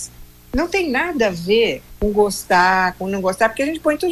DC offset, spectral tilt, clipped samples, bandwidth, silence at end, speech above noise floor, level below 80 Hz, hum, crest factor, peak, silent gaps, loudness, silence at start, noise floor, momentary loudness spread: under 0.1%; -4 dB/octave; under 0.1%; 15.5 kHz; 0 s; 20 dB; -38 dBFS; 60 Hz at -45 dBFS; 16 dB; -2 dBFS; none; -18 LUFS; 0 s; -38 dBFS; 7 LU